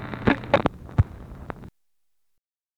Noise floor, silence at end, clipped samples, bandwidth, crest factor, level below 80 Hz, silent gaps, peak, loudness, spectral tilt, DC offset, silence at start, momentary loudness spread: -82 dBFS; 1.1 s; under 0.1%; 9.2 kHz; 24 dB; -40 dBFS; none; -2 dBFS; -24 LUFS; -8 dB/octave; under 0.1%; 0 s; 18 LU